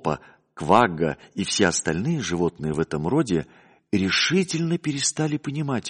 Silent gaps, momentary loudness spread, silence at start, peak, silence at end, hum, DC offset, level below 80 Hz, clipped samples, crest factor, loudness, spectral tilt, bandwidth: none; 9 LU; 0.05 s; -4 dBFS; 0 s; none; under 0.1%; -52 dBFS; under 0.1%; 20 dB; -23 LUFS; -4.5 dB/octave; 10.5 kHz